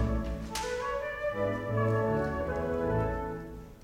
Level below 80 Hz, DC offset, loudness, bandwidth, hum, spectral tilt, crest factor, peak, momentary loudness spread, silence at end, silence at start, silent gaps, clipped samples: -42 dBFS; under 0.1%; -32 LUFS; 16 kHz; none; -6.5 dB/octave; 14 dB; -18 dBFS; 7 LU; 0 s; 0 s; none; under 0.1%